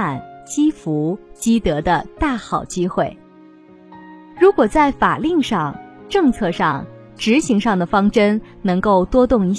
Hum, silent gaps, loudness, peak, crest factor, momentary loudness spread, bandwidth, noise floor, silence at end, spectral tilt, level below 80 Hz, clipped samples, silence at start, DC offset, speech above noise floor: none; none; -18 LUFS; -2 dBFS; 16 dB; 9 LU; 11 kHz; -44 dBFS; 0 s; -6 dB/octave; -38 dBFS; under 0.1%; 0 s; under 0.1%; 28 dB